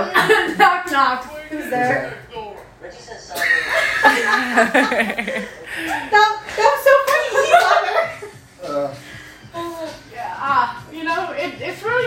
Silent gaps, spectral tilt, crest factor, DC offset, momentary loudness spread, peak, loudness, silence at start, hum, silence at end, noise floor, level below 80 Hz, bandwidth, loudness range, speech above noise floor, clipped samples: none; -3 dB/octave; 18 dB; under 0.1%; 20 LU; 0 dBFS; -17 LUFS; 0 s; none; 0 s; -38 dBFS; -54 dBFS; 16.5 kHz; 8 LU; 20 dB; under 0.1%